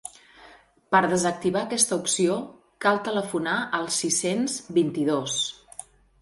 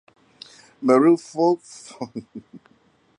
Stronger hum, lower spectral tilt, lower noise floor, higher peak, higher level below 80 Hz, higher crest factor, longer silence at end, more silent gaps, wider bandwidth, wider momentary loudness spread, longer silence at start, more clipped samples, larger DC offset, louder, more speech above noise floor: neither; second, -3 dB/octave vs -6.5 dB/octave; second, -53 dBFS vs -60 dBFS; about the same, -6 dBFS vs -4 dBFS; first, -64 dBFS vs -72 dBFS; about the same, 20 dB vs 20 dB; second, 0.4 s vs 0.6 s; neither; first, 12 kHz vs 10.5 kHz; second, 9 LU vs 25 LU; second, 0.05 s vs 0.8 s; neither; neither; second, -24 LUFS vs -19 LUFS; second, 28 dB vs 39 dB